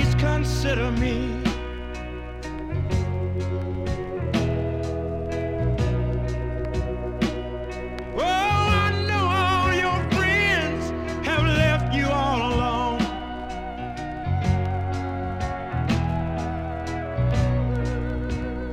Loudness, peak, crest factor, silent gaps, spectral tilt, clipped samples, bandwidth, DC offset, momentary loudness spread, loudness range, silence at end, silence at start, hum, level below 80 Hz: -25 LUFS; -8 dBFS; 16 dB; none; -6 dB/octave; under 0.1%; 13.5 kHz; under 0.1%; 12 LU; 6 LU; 0 s; 0 s; none; -32 dBFS